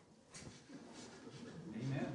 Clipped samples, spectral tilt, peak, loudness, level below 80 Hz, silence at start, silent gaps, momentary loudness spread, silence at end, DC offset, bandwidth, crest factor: under 0.1%; -6 dB/octave; -28 dBFS; -50 LUFS; -76 dBFS; 0 s; none; 12 LU; 0 s; under 0.1%; 10.5 kHz; 20 dB